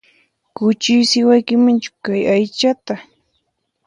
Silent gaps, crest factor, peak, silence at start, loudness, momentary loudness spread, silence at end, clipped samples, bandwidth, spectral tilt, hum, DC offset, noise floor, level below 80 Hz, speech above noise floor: none; 16 dB; -2 dBFS; 0.6 s; -15 LUFS; 10 LU; 0.85 s; under 0.1%; 10.5 kHz; -4.5 dB/octave; none; under 0.1%; -69 dBFS; -62 dBFS; 55 dB